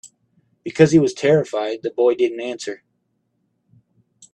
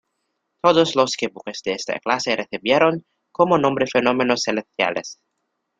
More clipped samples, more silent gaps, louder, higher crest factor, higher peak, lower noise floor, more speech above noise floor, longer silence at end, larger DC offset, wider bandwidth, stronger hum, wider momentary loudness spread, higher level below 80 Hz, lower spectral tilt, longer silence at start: neither; neither; about the same, -18 LUFS vs -20 LUFS; about the same, 20 dB vs 18 dB; about the same, 0 dBFS vs -2 dBFS; second, -70 dBFS vs -75 dBFS; about the same, 52 dB vs 55 dB; first, 1.6 s vs 0.65 s; neither; about the same, 9.6 kHz vs 9.2 kHz; neither; first, 17 LU vs 11 LU; about the same, -60 dBFS vs -62 dBFS; first, -6 dB/octave vs -4 dB/octave; second, 0.05 s vs 0.65 s